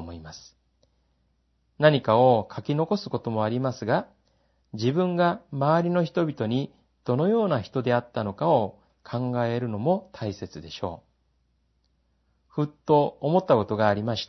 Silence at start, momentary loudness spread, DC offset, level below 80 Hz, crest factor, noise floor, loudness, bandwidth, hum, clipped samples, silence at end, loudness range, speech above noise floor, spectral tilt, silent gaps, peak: 0 s; 14 LU; under 0.1%; -64 dBFS; 22 dB; -70 dBFS; -25 LUFS; 6.2 kHz; none; under 0.1%; 0.05 s; 6 LU; 45 dB; -7.5 dB/octave; none; -4 dBFS